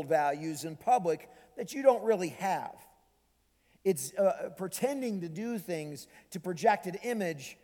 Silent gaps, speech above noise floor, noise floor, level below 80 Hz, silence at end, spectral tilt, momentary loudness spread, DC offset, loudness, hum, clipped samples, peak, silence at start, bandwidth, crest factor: none; 40 dB; -72 dBFS; -76 dBFS; 0.1 s; -5 dB/octave; 13 LU; under 0.1%; -32 LUFS; none; under 0.1%; -10 dBFS; 0 s; 19 kHz; 22 dB